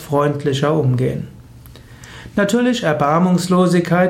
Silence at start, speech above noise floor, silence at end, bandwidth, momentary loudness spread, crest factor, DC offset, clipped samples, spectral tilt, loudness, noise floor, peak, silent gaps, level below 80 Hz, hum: 0 s; 25 dB; 0 s; 16 kHz; 13 LU; 14 dB; under 0.1%; under 0.1%; -6.5 dB/octave; -16 LUFS; -40 dBFS; -4 dBFS; none; -46 dBFS; none